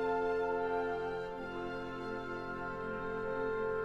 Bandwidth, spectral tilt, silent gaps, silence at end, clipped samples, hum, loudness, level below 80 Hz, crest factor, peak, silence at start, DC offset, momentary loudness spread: 8.2 kHz; -7 dB/octave; none; 0 s; under 0.1%; none; -38 LUFS; -56 dBFS; 14 dB; -24 dBFS; 0 s; under 0.1%; 7 LU